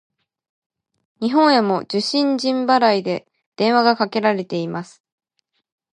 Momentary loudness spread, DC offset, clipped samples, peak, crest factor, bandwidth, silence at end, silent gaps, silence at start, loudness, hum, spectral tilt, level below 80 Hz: 11 LU; under 0.1%; under 0.1%; -2 dBFS; 18 dB; 11 kHz; 1.1 s; 3.46-3.52 s; 1.2 s; -18 LUFS; none; -5 dB/octave; -72 dBFS